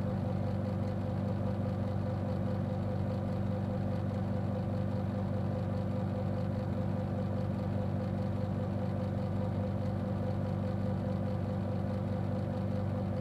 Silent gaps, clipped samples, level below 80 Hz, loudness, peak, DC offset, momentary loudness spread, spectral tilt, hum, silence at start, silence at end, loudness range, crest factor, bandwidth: none; under 0.1%; -52 dBFS; -35 LUFS; -22 dBFS; under 0.1%; 1 LU; -9.5 dB/octave; none; 0 s; 0 s; 0 LU; 12 dB; 8 kHz